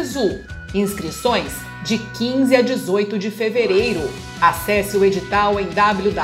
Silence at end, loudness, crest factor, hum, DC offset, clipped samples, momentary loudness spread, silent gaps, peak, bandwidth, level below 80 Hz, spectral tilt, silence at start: 0 s; -19 LUFS; 18 dB; none; under 0.1%; under 0.1%; 8 LU; none; 0 dBFS; 16 kHz; -42 dBFS; -5 dB/octave; 0 s